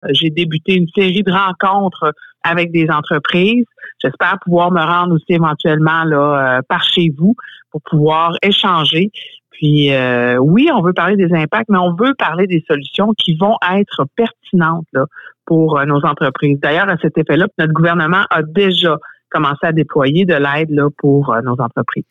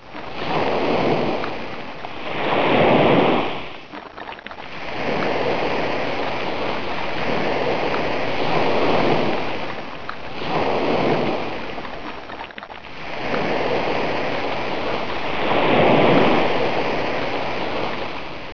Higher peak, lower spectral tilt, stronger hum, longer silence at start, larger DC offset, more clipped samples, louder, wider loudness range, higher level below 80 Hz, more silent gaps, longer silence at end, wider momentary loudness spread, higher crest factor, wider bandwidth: about the same, -4 dBFS vs -4 dBFS; about the same, -7.5 dB/octave vs -6.5 dB/octave; neither; about the same, 0.05 s vs 0 s; second, under 0.1% vs 5%; neither; first, -13 LUFS vs -21 LUFS; second, 2 LU vs 6 LU; second, -56 dBFS vs -48 dBFS; neither; about the same, 0.1 s vs 0.05 s; second, 6 LU vs 16 LU; second, 10 dB vs 18 dB; first, 7.2 kHz vs 5.4 kHz